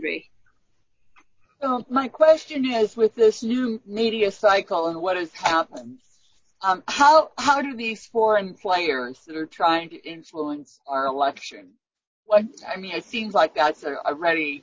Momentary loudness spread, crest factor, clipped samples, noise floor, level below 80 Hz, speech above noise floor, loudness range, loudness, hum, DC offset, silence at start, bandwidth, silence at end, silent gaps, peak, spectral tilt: 15 LU; 18 dB; under 0.1%; -70 dBFS; -66 dBFS; 47 dB; 5 LU; -22 LUFS; none; under 0.1%; 0 s; 7.8 kHz; 0.05 s; 12.07-12.23 s; -4 dBFS; -3.5 dB/octave